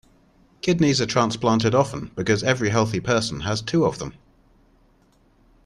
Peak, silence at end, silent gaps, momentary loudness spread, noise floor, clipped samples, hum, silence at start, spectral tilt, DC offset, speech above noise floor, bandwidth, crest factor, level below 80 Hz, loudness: -4 dBFS; 1.55 s; none; 8 LU; -59 dBFS; under 0.1%; none; 0.65 s; -5 dB/octave; under 0.1%; 38 dB; 12 kHz; 18 dB; -50 dBFS; -22 LUFS